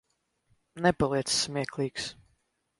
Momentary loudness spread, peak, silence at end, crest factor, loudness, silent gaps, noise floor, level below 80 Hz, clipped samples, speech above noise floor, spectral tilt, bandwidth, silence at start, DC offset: 9 LU; -10 dBFS; 0.7 s; 22 dB; -29 LUFS; none; -74 dBFS; -56 dBFS; under 0.1%; 45 dB; -3.5 dB/octave; 11.5 kHz; 0.75 s; under 0.1%